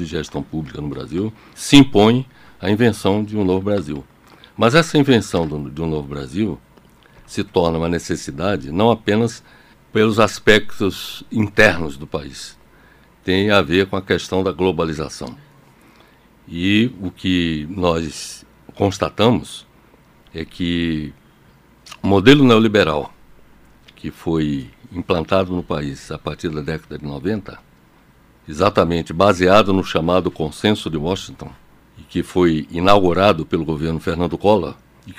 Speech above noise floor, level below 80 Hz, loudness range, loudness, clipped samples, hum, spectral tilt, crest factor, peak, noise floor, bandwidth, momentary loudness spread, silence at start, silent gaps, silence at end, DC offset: 33 dB; -42 dBFS; 6 LU; -18 LUFS; under 0.1%; none; -5.5 dB/octave; 18 dB; 0 dBFS; -51 dBFS; 16 kHz; 17 LU; 0 s; none; 0.05 s; under 0.1%